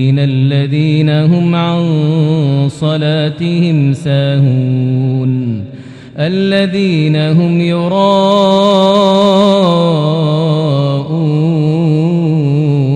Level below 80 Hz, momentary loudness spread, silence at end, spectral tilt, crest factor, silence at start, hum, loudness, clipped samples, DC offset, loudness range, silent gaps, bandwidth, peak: -52 dBFS; 5 LU; 0 s; -8 dB/octave; 10 dB; 0 s; none; -11 LUFS; 0.3%; under 0.1%; 4 LU; none; 9.4 kHz; 0 dBFS